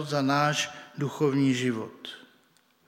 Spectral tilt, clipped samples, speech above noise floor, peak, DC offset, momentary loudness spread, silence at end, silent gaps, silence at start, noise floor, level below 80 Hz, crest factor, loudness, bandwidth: -5 dB/octave; under 0.1%; 38 dB; -10 dBFS; under 0.1%; 17 LU; 0.7 s; none; 0 s; -65 dBFS; -74 dBFS; 18 dB; -27 LUFS; 16 kHz